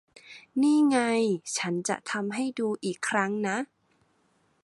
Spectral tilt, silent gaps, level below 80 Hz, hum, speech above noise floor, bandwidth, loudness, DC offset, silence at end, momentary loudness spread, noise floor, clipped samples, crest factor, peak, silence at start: -4 dB/octave; none; -76 dBFS; none; 42 dB; 11.5 kHz; -27 LUFS; under 0.1%; 1 s; 11 LU; -69 dBFS; under 0.1%; 18 dB; -10 dBFS; 0.25 s